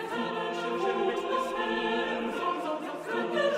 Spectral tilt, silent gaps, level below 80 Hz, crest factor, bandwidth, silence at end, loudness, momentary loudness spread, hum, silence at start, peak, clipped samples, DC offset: -4.5 dB/octave; none; -66 dBFS; 16 dB; 15.5 kHz; 0 s; -31 LUFS; 4 LU; none; 0 s; -16 dBFS; under 0.1%; under 0.1%